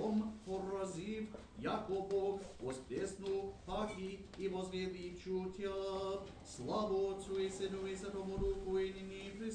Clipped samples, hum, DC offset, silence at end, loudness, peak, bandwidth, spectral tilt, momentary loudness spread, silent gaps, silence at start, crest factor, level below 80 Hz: under 0.1%; none; under 0.1%; 0 s; -42 LUFS; -26 dBFS; 10 kHz; -5.5 dB/octave; 8 LU; none; 0 s; 14 dB; -58 dBFS